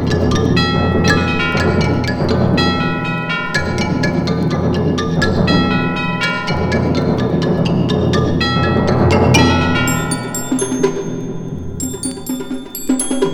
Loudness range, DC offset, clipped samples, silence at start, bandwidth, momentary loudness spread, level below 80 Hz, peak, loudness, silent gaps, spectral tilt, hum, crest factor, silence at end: 3 LU; under 0.1%; under 0.1%; 0 s; 17 kHz; 9 LU; -34 dBFS; 0 dBFS; -16 LUFS; none; -5.5 dB/octave; none; 16 dB; 0 s